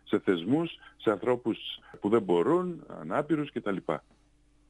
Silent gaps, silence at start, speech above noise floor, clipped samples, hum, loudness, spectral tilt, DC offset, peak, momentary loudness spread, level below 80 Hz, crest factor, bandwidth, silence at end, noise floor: none; 0.05 s; 34 dB; under 0.1%; none; -30 LUFS; -7.5 dB/octave; under 0.1%; -12 dBFS; 11 LU; -66 dBFS; 18 dB; 9.8 kHz; 0.7 s; -64 dBFS